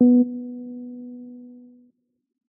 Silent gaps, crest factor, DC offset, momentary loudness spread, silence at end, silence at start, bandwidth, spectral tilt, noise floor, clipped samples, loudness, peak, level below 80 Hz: none; 18 dB; under 0.1%; 24 LU; 1.1 s; 0 s; 1 kHz; -4.5 dB/octave; -63 dBFS; under 0.1%; -24 LUFS; -6 dBFS; -78 dBFS